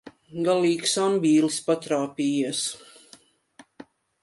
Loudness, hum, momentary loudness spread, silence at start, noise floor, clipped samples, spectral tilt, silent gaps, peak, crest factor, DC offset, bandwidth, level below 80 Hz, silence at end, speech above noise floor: -24 LUFS; none; 9 LU; 0.05 s; -55 dBFS; under 0.1%; -4 dB/octave; none; -10 dBFS; 16 dB; under 0.1%; 11.5 kHz; -74 dBFS; 0.4 s; 32 dB